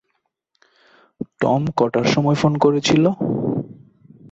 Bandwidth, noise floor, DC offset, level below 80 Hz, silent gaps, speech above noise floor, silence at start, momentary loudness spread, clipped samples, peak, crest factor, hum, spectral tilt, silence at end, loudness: 8 kHz; -72 dBFS; under 0.1%; -56 dBFS; none; 55 dB; 1.2 s; 13 LU; under 0.1%; -4 dBFS; 16 dB; none; -6 dB/octave; 0.05 s; -18 LUFS